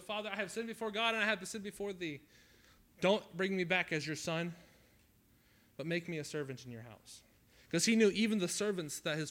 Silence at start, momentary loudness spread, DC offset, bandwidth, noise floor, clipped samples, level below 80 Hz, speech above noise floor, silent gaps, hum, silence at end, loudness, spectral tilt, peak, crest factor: 0 s; 20 LU; under 0.1%; 16.5 kHz; -68 dBFS; under 0.1%; -72 dBFS; 32 dB; none; none; 0 s; -36 LUFS; -4 dB/octave; -18 dBFS; 20 dB